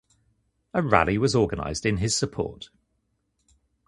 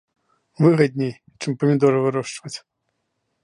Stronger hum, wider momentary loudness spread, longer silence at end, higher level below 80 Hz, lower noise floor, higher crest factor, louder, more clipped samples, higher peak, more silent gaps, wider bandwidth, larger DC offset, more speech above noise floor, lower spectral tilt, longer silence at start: neither; second, 12 LU vs 16 LU; first, 1.25 s vs 0.85 s; first, -44 dBFS vs -68 dBFS; about the same, -74 dBFS vs -74 dBFS; first, 26 dB vs 18 dB; second, -24 LUFS vs -20 LUFS; neither; first, 0 dBFS vs -4 dBFS; neither; about the same, 11.5 kHz vs 11 kHz; neither; second, 50 dB vs 55 dB; second, -4.5 dB/octave vs -7 dB/octave; first, 0.75 s vs 0.6 s